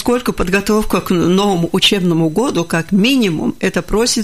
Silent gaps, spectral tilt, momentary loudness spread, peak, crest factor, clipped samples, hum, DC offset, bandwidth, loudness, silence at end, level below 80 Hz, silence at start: none; -4.5 dB/octave; 5 LU; -2 dBFS; 14 dB; under 0.1%; none; 1%; 15.5 kHz; -14 LUFS; 0 s; -32 dBFS; 0 s